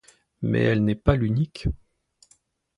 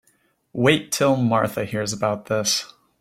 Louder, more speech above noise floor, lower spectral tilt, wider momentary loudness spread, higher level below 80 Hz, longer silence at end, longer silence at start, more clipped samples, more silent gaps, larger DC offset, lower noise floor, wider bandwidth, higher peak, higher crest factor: second, -24 LUFS vs -21 LUFS; about the same, 41 dB vs 43 dB; first, -8.5 dB/octave vs -4 dB/octave; first, 10 LU vs 7 LU; first, -36 dBFS vs -60 dBFS; first, 1 s vs 0.35 s; second, 0.4 s vs 0.55 s; neither; neither; neither; about the same, -63 dBFS vs -64 dBFS; second, 11 kHz vs 16.5 kHz; about the same, -4 dBFS vs -4 dBFS; about the same, 22 dB vs 20 dB